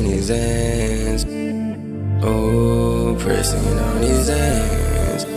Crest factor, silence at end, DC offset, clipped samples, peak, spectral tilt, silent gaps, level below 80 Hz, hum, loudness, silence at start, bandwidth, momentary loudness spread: 14 dB; 0 s; under 0.1%; under 0.1%; -4 dBFS; -5.5 dB/octave; none; -24 dBFS; none; -19 LUFS; 0 s; 16 kHz; 6 LU